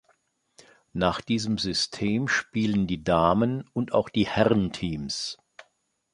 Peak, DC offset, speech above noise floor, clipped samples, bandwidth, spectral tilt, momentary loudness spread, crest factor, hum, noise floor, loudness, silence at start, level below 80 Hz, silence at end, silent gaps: -4 dBFS; under 0.1%; 46 dB; under 0.1%; 11 kHz; -5 dB/octave; 9 LU; 22 dB; none; -71 dBFS; -26 LUFS; 0.95 s; -50 dBFS; 0.5 s; none